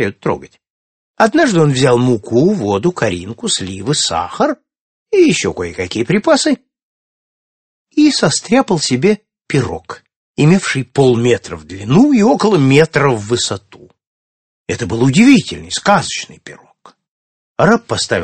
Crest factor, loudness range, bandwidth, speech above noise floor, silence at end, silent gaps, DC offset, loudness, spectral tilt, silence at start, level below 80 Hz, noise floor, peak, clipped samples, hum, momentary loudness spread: 14 dB; 3 LU; 9 kHz; over 77 dB; 0 s; 0.70-1.14 s, 4.80-5.06 s, 6.83-7.86 s, 10.16-10.34 s, 14.07-14.66 s, 17.08-17.55 s; under 0.1%; -13 LUFS; -5 dB/octave; 0 s; -48 dBFS; under -90 dBFS; 0 dBFS; under 0.1%; none; 12 LU